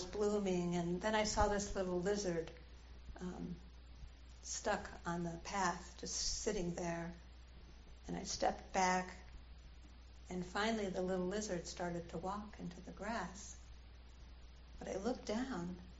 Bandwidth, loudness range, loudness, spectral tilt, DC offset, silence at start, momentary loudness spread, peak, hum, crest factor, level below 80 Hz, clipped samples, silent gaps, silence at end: 8 kHz; 6 LU; -41 LUFS; -4 dB/octave; under 0.1%; 0 s; 22 LU; -20 dBFS; none; 22 dB; -54 dBFS; under 0.1%; none; 0 s